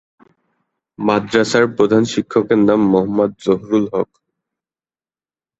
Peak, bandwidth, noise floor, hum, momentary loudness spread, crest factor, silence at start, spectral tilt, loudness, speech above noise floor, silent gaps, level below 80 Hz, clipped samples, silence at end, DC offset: -2 dBFS; 8.2 kHz; under -90 dBFS; none; 7 LU; 16 dB; 1 s; -6 dB/octave; -16 LUFS; over 75 dB; none; -54 dBFS; under 0.1%; 1.55 s; under 0.1%